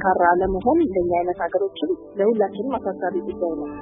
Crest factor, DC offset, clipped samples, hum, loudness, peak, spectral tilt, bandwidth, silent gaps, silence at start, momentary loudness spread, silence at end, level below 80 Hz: 16 dB; under 0.1%; under 0.1%; none; -22 LUFS; -4 dBFS; -11 dB/octave; 3.8 kHz; none; 0 s; 8 LU; 0 s; -44 dBFS